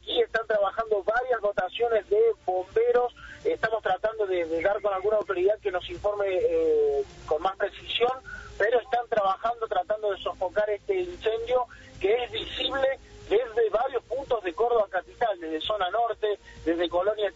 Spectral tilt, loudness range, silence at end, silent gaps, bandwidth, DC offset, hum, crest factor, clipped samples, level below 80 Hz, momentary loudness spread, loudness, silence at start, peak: -1.5 dB/octave; 2 LU; 0.05 s; none; 7.6 kHz; under 0.1%; none; 16 dB; under 0.1%; -54 dBFS; 6 LU; -27 LUFS; 0.05 s; -12 dBFS